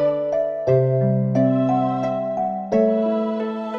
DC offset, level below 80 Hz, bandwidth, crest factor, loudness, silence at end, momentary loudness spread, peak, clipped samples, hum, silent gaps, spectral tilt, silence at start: under 0.1%; -58 dBFS; 6.2 kHz; 12 dB; -20 LUFS; 0 s; 6 LU; -6 dBFS; under 0.1%; none; none; -9.5 dB/octave; 0 s